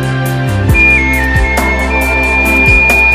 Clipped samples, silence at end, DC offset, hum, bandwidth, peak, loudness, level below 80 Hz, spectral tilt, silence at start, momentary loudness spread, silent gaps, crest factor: 0.1%; 0 s; 0.3%; none; 16 kHz; 0 dBFS; -9 LUFS; -16 dBFS; -5.5 dB/octave; 0 s; 8 LU; none; 10 dB